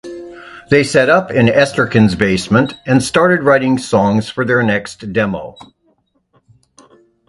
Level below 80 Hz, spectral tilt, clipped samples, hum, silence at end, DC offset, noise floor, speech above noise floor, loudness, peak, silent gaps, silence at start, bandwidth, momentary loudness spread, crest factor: -44 dBFS; -6 dB/octave; under 0.1%; none; 1.8 s; under 0.1%; -60 dBFS; 47 dB; -13 LUFS; 0 dBFS; none; 0.05 s; 11.5 kHz; 13 LU; 14 dB